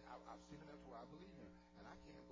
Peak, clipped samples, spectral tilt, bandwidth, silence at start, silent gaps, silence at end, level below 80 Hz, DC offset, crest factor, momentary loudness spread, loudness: -42 dBFS; under 0.1%; -6 dB/octave; 8 kHz; 0 s; none; 0 s; -72 dBFS; under 0.1%; 16 dB; 4 LU; -60 LUFS